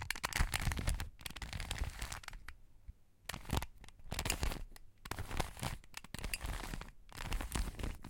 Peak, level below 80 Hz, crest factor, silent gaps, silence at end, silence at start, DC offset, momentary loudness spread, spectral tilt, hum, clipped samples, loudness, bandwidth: -14 dBFS; -44 dBFS; 26 dB; none; 0 s; 0 s; under 0.1%; 18 LU; -3.5 dB/octave; none; under 0.1%; -42 LUFS; 17 kHz